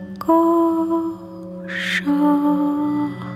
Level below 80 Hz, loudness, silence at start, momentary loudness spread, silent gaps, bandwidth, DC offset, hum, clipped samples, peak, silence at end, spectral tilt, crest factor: -58 dBFS; -19 LUFS; 0 s; 13 LU; none; 14 kHz; under 0.1%; none; under 0.1%; -4 dBFS; 0 s; -6 dB/octave; 16 dB